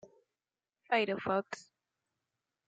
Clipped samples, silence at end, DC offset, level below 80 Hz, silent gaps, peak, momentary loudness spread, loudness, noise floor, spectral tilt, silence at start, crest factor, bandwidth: under 0.1%; 1.05 s; under 0.1%; -80 dBFS; none; -16 dBFS; 15 LU; -33 LUFS; under -90 dBFS; -5 dB/octave; 0.05 s; 22 dB; 9 kHz